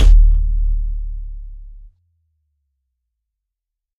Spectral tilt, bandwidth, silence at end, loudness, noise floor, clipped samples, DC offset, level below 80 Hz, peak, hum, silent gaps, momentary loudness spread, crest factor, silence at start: -6.5 dB/octave; 3.7 kHz; 2.2 s; -19 LUFS; -83 dBFS; under 0.1%; under 0.1%; -16 dBFS; 0 dBFS; none; none; 24 LU; 16 dB; 0 s